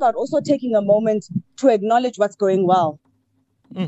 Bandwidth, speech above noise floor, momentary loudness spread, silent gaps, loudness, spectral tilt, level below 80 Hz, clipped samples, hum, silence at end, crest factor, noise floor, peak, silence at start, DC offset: 8.2 kHz; 48 dB; 8 LU; none; -19 LUFS; -6.5 dB/octave; -70 dBFS; under 0.1%; none; 0 s; 16 dB; -66 dBFS; -4 dBFS; 0 s; under 0.1%